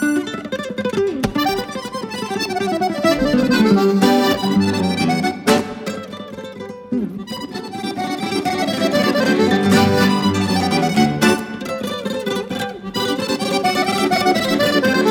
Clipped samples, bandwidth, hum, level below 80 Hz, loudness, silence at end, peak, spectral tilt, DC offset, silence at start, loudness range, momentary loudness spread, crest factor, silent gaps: under 0.1%; 19 kHz; none; -48 dBFS; -18 LUFS; 0 s; -2 dBFS; -5 dB/octave; under 0.1%; 0 s; 6 LU; 12 LU; 16 dB; none